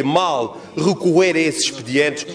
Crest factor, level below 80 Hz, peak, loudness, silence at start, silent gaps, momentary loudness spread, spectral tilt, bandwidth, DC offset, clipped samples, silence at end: 14 dB; -60 dBFS; -2 dBFS; -18 LUFS; 0 s; none; 7 LU; -4 dB/octave; 11 kHz; under 0.1%; under 0.1%; 0 s